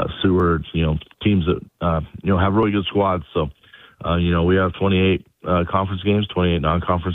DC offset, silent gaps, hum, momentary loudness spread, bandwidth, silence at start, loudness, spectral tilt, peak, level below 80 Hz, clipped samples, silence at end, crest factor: under 0.1%; none; none; 6 LU; 4 kHz; 0 s; -20 LUFS; -10 dB/octave; -2 dBFS; -36 dBFS; under 0.1%; 0 s; 16 dB